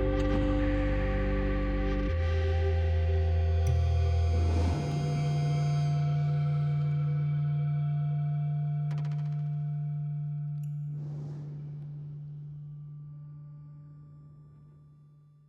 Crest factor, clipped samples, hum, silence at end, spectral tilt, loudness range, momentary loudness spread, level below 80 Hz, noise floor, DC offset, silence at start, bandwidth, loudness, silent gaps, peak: 14 dB; under 0.1%; none; 0.8 s; -8.5 dB/octave; 15 LU; 16 LU; -36 dBFS; -57 dBFS; under 0.1%; 0 s; 8 kHz; -30 LUFS; none; -16 dBFS